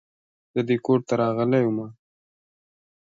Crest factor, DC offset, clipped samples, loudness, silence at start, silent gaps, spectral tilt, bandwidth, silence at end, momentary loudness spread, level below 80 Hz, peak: 16 dB; under 0.1%; under 0.1%; -23 LUFS; 0.55 s; none; -8 dB/octave; 7.6 kHz; 1.15 s; 10 LU; -68 dBFS; -8 dBFS